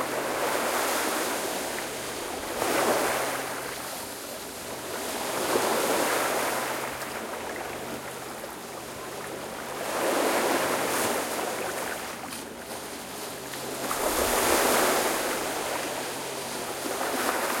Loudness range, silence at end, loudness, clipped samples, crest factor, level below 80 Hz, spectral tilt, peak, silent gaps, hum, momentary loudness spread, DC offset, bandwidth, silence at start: 5 LU; 0 s; -28 LUFS; under 0.1%; 20 dB; -58 dBFS; -2 dB/octave; -8 dBFS; none; none; 12 LU; under 0.1%; 16.5 kHz; 0 s